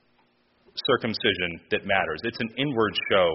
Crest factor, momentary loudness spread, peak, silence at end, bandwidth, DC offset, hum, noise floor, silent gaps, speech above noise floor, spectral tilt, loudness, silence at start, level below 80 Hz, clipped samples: 20 dB; 7 LU; -6 dBFS; 0 s; 6 kHz; under 0.1%; none; -65 dBFS; none; 40 dB; -2 dB/octave; -25 LUFS; 0.75 s; -58 dBFS; under 0.1%